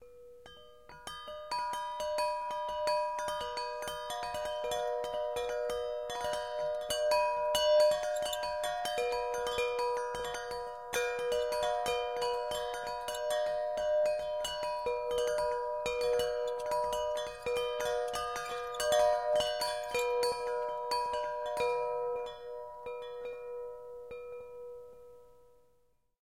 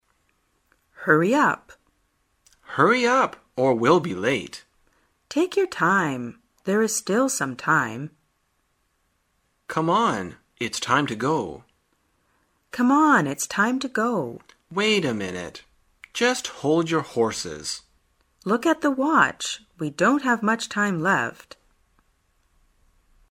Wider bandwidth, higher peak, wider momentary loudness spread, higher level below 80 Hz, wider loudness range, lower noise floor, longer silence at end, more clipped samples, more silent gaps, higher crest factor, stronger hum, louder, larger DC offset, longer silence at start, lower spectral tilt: about the same, 16.5 kHz vs 16 kHz; second, -16 dBFS vs -4 dBFS; about the same, 14 LU vs 14 LU; about the same, -62 dBFS vs -64 dBFS; about the same, 6 LU vs 4 LU; about the same, -73 dBFS vs -70 dBFS; second, 0.95 s vs 2 s; neither; neither; about the same, 18 dB vs 22 dB; neither; second, -34 LUFS vs -22 LUFS; neither; second, 0 s vs 1 s; second, -1.5 dB/octave vs -4 dB/octave